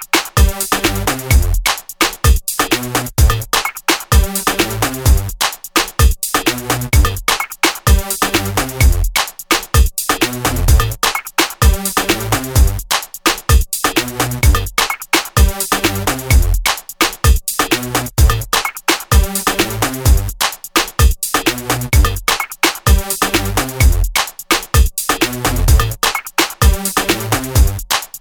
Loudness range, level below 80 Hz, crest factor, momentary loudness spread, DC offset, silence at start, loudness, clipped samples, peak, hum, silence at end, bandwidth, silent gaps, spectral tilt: 1 LU; -18 dBFS; 14 dB; 3 LU; under 0.1%; 0 s; -15 LUFS; under 0.1%; 0 dBFS; none; 0 s; over 20 kHz; none; -3.5 dB/octave